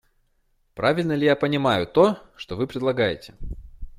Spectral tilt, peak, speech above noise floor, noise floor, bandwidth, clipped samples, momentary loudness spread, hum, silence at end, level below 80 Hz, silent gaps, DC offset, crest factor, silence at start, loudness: -6.5 dB/octave; -4 dBFS; 44 dB; -66 dBFS; 14.5 kHz; under 0.1%; 20 LU; none; 0.05 s; -44 dBFS; none; under 0.1%; 20 dB; 0.75 s; -22 LUFS